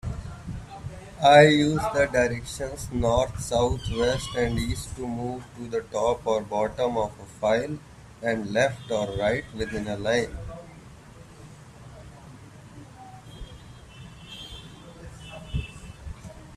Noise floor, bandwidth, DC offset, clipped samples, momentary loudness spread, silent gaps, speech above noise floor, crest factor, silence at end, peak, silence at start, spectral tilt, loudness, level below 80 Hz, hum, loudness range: -47 dBFS; 14 kHz; under 0.1%; under 0.1%; 23 LU; none; 23 dB; 24 dB; 0 s; -2 dBFS; 0.05 s; -5 dB/octave; -25 LUFS; -44 dBFS; none; 22 LU